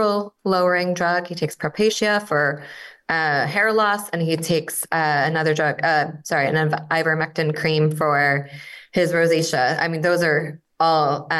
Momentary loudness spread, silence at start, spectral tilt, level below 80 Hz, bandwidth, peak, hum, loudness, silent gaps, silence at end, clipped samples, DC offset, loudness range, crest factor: 6 LU; 0 s; -4.5 dB/octave; -64 dBFS; 13 kHz; -6 dBFS; none; -20 LUFS; none; 0 s; under 0.1%; under 0.1%; 1 LU; 14 dB